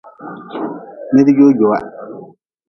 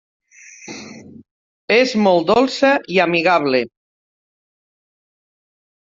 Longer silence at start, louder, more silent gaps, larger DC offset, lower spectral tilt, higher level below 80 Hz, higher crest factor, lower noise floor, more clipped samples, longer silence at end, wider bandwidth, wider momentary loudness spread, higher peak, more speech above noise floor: second, 0.2 s vs 0.65 s; about the same, -13 LUFS vs -15 LUFS; second, none vs 1.31-1.68 s; neither; first, -9 dB/octave vs -5 dB/octave; about the same, -58 dBFS vs -60 dBFS; about the same, 16 dB vs 18 dB; about the same, -39 dBFS vs -39 dBFS; neither; second, 0.45 s vs 2.3 s; second, 6.2 kHz vs 7.8 kHz; first, 23 LU vs 20 LU; about the same, 0 dBFS vs -2 dBFS; about the same, 26 dB vs 25 dB